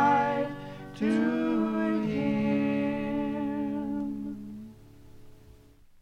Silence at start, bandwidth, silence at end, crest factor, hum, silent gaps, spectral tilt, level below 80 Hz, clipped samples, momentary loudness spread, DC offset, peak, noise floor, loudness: 0 s; 9.8 kHz; 0.5 s; 18 dB; none; none; -7.5 dB/octave; -58 dBFS; under 0.1%; 15 LU; under 0.1%; -12 dBFS; -55 dBFS; -29 LUFS